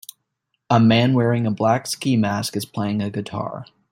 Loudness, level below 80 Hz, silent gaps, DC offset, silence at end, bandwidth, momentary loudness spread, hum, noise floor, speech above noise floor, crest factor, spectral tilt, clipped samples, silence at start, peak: -20 LUFS; -58 dBFS; none; under 0.1%; 0.25 s; 16.5 kHz; 13 LU; none; -75 dBFS; 55 dB; 18 dB; -6 dB/octave; under 0.1%; 0.7 s; -2 dBFS